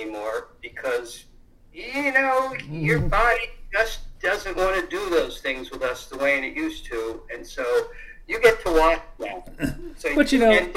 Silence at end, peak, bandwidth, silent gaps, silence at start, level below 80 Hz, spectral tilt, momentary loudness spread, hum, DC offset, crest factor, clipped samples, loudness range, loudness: 0 s; -4 dBFS; 16 kHz; none; 0 s; -36 dBFS; -5 dB/octave; 15 LU; none; under 0.1%; 20 dB; under 0.1%; 3 LU; -23 LUFS